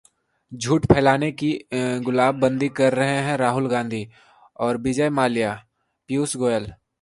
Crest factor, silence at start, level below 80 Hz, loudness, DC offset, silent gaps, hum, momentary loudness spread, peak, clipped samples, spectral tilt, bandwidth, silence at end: 22 dB; 0.5 s; -48 dBFS; -22 LUFS; under 0.1%; none; none; 11 LU; 0 dBFS; under 0.1%; -5.5 dB/octave; 11.5 kHz; 0.25 s